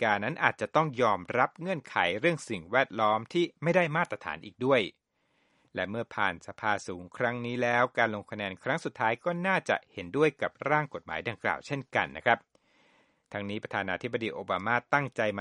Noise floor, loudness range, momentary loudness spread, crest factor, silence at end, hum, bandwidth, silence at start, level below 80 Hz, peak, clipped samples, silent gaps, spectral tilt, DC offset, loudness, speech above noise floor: -73 dBFS; 4 LU; 9 LU; 24 dB; 0 s; none; 11.5 kHz; 0 s; -68 dBFS; -6 dBFS; under 0.1%; none; -5.5 dB/octave; under 0.1%; -30 LUFS; 43 dB